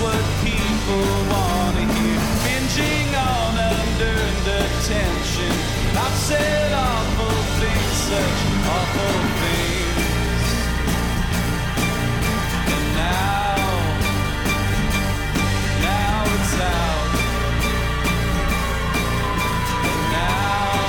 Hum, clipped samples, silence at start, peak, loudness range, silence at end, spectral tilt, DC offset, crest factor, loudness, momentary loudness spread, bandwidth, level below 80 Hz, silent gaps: none; under 0.1%; 0 s; -10 dBFS; 1 LU; 0 s; -4.5 dB/octave; under 0.1%; 10 dB; -20 LUFS; 2 LU; 19 kHz; -26 dBFS; none